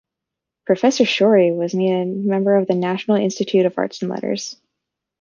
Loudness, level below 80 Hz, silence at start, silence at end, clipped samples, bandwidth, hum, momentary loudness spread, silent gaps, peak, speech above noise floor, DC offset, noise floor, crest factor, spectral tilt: -18 LUFS; -68 dBFS; 0.65 s; 0.7 s; under 0.1%; 7.4 kHz; none; 10 LU; none; -2 dBFS; 66 dB; under 0.1%; -84 dBFS; 16 dB; -5.5 dB/octave